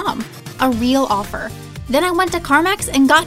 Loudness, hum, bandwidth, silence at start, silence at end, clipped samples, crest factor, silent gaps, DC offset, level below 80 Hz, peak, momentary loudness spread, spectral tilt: -17 LUFS; none; 16 kHz; 0 s; 0 s; under 0.1%; 16 dB; none; under 0.1%; -38 dBFS; 0 dBFS; 13 LU; -3.5 dB/octave